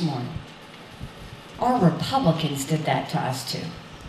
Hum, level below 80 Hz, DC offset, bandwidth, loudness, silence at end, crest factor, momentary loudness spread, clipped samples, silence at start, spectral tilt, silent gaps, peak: none; -50 dBFS; under 0.1%; 15 kHz; -24 LUFS; 0 s; 18 dB; 20 LU; under 0.1%; 0 s; -5.5 dB/octave; none; -6 dBFS